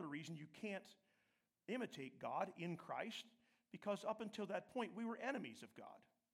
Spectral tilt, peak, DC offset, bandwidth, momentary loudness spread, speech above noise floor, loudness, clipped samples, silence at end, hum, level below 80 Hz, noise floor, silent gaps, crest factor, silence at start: -5.5 dB/octave; -30 dBFS; under 0.1%; 16 kHz; 16 LU; 36 dB; -48 LUFS; under 0.1%; 0.35 s; none; under -90 dBFS; -85 dBFS; none; 20 dB; 0 s